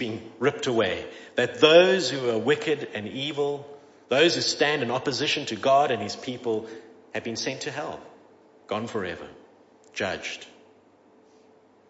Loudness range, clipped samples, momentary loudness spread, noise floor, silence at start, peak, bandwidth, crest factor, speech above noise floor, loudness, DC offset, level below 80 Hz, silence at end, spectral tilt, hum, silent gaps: 12 LU; under 0.1%; 15 LU; -57 dBFS; 0 s; -2 dBFS; 8 kHz; 24 dB; 32 dB; -25 LUFS; under 0.1%; -68 dBFS; 1.45 s; -3.5 dB/octave; none; none